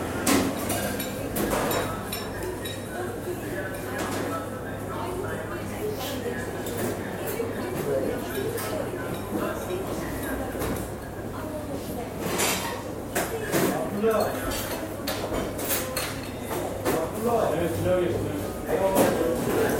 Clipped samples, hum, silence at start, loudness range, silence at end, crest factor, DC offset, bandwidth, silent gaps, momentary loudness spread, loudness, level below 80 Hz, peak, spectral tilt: under 0.1%; none; 0 s; 4 LU; 0 s; 20 dB; under 0.1%; 16.5 kHz; none; 8 LU; -28 LUFS; -46 dBFS; -8 dBFS; -4.5 dB/octave